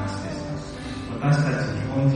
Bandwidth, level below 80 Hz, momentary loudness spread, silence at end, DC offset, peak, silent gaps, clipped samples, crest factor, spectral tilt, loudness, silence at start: 9.6 kHz; -44 dBFS; 11 LU; 0 s; under 0.1%; -8 dBFS; none; under 0.1%; 16 dB; -7 dB/octave; -26 LUFS; 0 s